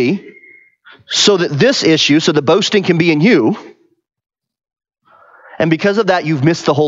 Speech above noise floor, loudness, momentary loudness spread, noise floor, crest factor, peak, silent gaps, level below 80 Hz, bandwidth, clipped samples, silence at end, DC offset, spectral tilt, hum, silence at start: 33 dB; -12 LUFS; 7 LU; -45 dBFS; 14 dB; 0 dBFS; none; -58 dBFS; 8 kHz; under 0.1%; 0 s; under 0.1%; -4.5 dB/octave; none; 0 s